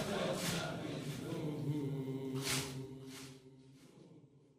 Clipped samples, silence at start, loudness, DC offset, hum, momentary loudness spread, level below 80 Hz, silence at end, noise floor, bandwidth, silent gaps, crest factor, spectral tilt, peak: under 0.1%; 0 s; -40 LUFS; under 0.1%; none; 23 LU; -68 dBFS; 0.15 s; -62 dBFS; 15.5 kHz; none; 16 dB; -4.5 dB/octave; -24 dBFS